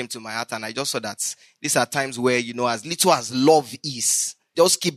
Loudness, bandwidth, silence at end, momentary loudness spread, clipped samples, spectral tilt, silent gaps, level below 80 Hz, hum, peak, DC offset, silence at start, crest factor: -22 LUFS; 13.5 kHz; 0 s; 11 LU; under 0.1%; -2.5 dB/octave; none; -70 dBFS; none; -4 dBFS; under 0.1%; 0 s; 18 dB